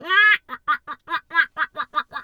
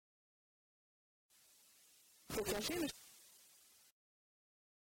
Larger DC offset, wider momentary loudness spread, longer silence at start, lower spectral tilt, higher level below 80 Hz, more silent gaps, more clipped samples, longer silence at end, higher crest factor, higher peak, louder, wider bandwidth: neither; second, 12 LU vs 25 LU; second, 0 s vs 2.3 s; second, -1.5 dB/octave vs -3 dB/octave; about the same, -68 dBFS vs -70 dBFS; neither; neither; second, 0 s vs 1.45 s; second, 16 dB vs 22 dB; first, -6 dBFS vs -28 dBFS; first, -21 LUFS vs -42 LUFS; second, 17.5 kHz vs 19.5 kHz